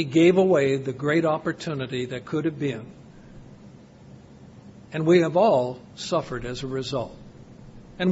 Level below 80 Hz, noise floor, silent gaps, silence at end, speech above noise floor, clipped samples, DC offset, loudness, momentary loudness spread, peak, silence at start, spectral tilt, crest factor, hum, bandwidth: -54 dBFS; -47 dBFS; none; 0 s; 24 dB; under 0.1%; under 0.1%; -24 LUFS; 14 LU; -6 dBFS; 0 s; -6.5 dB/octave; 18 dB; none; 8 kHz